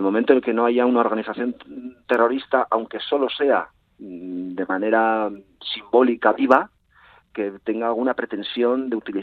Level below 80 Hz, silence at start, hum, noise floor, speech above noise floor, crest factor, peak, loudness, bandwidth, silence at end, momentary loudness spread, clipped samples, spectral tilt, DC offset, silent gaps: -66 dBFS; 0 s; none; -54 dBFS; 33 dB; 20 dB; 0 dBFS; -21 LUFS; 5.4 kHz; 0 s; 16 LU; under 0.1%; -7 dB/octave; under 0.1%; none